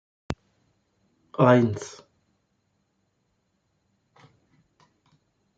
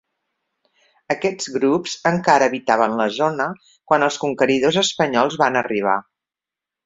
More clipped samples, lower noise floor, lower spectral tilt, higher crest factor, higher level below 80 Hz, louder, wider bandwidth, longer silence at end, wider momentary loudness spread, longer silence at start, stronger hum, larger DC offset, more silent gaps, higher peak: neither; second, -73 dBFS vs -88 dBFS; first, -7.5 dB/octave vs -4 dB/octave; about the same, 24 dB vs 20 dB; about the same, -60 dBFS vs -62 dBFS; about the same, -21 LUFS vs -19 LUFS; about the same, 8.4 kHz vs 8 kHz; first, 3.7 s vs 0.85 s; first, 20 LU vs 6 LU; second, 0.3 s vs 1.1 s; neither; neither; neither; second, -4 dBFS vs 0 dBFS